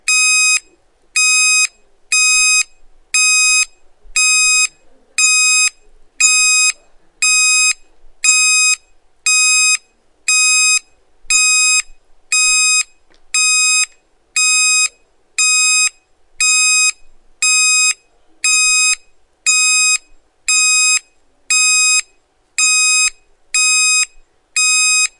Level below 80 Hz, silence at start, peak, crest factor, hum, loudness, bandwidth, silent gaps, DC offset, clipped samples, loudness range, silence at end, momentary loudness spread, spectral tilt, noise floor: -52 dBFS; 0.05 s; 0 dBFS; 14 dB; none; -11 LUFS; 11.5 kHz; none; under 0.1%; under 0.1%; 1 LU; 0.1 s; 9 LU; 7 dB/octave; -55 dBFS